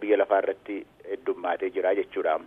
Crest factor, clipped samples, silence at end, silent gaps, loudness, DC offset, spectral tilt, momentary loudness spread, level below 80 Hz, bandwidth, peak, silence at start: 18 dB; under 0.1%; 0 s; none; -27 LUFS; under 0.1%; -6.5 dB/octave; 15 LU; -70 dBFS; 3.8 kHz; -8 dBFS; 0 s